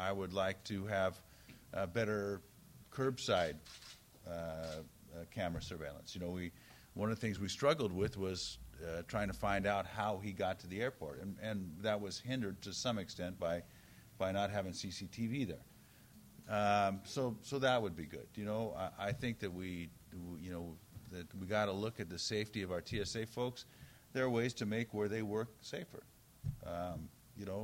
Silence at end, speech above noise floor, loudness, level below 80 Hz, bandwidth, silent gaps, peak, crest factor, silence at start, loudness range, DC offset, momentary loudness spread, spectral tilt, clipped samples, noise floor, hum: 0 s; 22 dB; -40 LUFS; -62 dBFS; 16 kHz; none; -20 dBFS; 20 dB; 0 s; 4 LU; under 0.1%; 16 LU; -5 dB/octave; under 0.1%; -62 dBFS; none